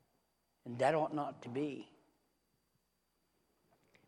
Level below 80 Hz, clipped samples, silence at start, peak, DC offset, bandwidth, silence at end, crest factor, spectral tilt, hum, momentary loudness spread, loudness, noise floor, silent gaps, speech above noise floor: -86 dBFS; under 0.1%; 0.65 s; -18 dBFS; under 0.1%; 11.5 kHz; 2.2 s; 24 dB; -6.5 dB/octave; none; 17 LU; -37 LUFS; -81 dBFS; none; 44 dB